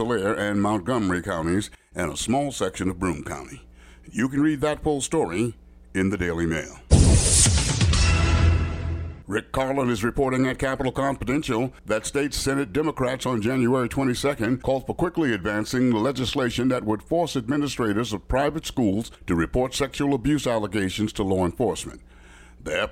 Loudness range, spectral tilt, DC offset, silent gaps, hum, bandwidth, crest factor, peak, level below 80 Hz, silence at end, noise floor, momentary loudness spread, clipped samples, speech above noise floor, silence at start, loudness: 6 LU; -5 dB/octave; under 0.1%; none; none; 16 kHz; 20 dB; -4 dBFS; -34 dBFS; 0 s; -48 dBFS; 8 LU; under 0.1%; 23 dB; 0 s; -24 LUFS